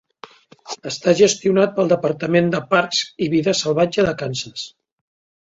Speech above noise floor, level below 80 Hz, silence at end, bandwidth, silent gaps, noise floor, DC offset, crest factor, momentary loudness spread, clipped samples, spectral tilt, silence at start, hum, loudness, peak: 26 dB; -54 dBFS; 0.8 s; 8 kHz; none; -44 dBFS; under 0.1%; 18 dB; 15 LU; under 0.1%; -4.5 dB/octave; 0.65 s; none; -18 LUFS; -2 dBFS